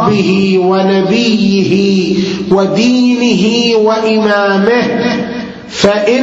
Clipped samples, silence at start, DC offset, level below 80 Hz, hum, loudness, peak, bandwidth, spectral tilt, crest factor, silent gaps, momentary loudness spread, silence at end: under 0.1%; 0 s; under 0.1%; -46 dBFS; none; -10 LUFS; 0 dBFS; 8 kHz; -5.5 dB/octave; 10 dB; none; 4 LU; 0 s